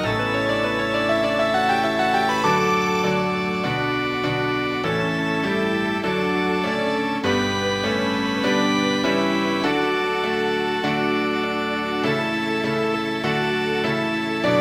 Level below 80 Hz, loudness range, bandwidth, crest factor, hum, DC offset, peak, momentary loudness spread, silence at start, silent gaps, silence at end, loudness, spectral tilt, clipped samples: -52 dBFS; 2 LU; 16 kHz; 14 dB; none; under 0.1%; -6 dBFS; 3 LU; 0 s; none; 0 s; -21 LUFS; -5 dB/octave; under 0.1%